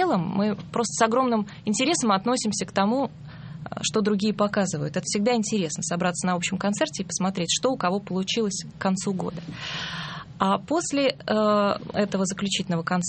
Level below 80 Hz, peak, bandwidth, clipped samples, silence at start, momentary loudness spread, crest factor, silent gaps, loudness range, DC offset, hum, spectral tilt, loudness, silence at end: -58 dBFS; -6 dBFS; 8.8 kHz; under 0.1%; 0 s; 8 LU; 20 dB; none; 2 LU; under 0.1%; none; -4 dB/octave; -25 LUFS; 0 s